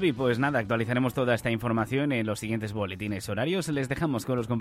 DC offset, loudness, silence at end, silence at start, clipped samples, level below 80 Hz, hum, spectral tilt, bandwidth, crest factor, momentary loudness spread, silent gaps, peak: under 0.1%; -28 LUFS; 0 s; 0 s; under 0.1%; -56 dBFS; none; -6 dB/octave; 15.5 kHz; 16 dB; 6 LU; none; -12 dBFS